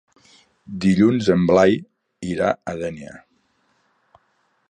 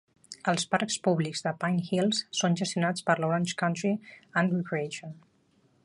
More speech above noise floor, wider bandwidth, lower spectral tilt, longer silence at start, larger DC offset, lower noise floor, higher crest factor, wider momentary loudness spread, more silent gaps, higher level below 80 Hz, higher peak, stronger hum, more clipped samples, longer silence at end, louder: first, 47 dB vs 38 dB; second, 9.8 kHz vs 11.5 kHz; first, -7 dB/octave vs -4.5 dB/octave; first, 0.7 s vs 0.3 s; neither; about the same, -66 dBFS vs -67 dBFS; about the same, 18 dB vs 20 dB; first, 19 LU vs 7 LU; neither; first, -50 dBFS vs -72 dBFS; first, -2 dBFS vs -8 dBFS; neither; neither; first, 1.55 s vs 0.65 s; first, -19 LUFS vs -29 LUFS